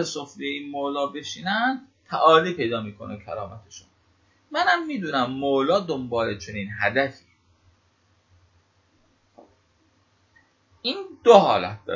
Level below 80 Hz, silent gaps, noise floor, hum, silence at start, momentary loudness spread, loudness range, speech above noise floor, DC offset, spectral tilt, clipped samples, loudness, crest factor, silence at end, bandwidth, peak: -58 dBFS; none; -64 dBFS; none; 0 s; 17 LU; 8 LU; 41 dB; under 0.1%; -4.5 dB/octave; under 0.1%; -23 LUFS; 24 dB; 0 s; 7.6 kHz; 0 dBFS